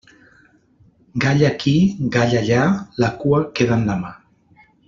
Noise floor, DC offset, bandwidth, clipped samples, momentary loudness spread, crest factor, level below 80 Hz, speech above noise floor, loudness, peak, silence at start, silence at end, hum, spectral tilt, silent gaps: -54 dBFS; under 0.1%; 7.4 kHz; under 0.1%; 6 LU; 16 dB; -48 dBFS; 37 dB; -18 LUFS; -4 dBFS; 1.15 s; 0.75 s; none; -6.5 dB/octave; none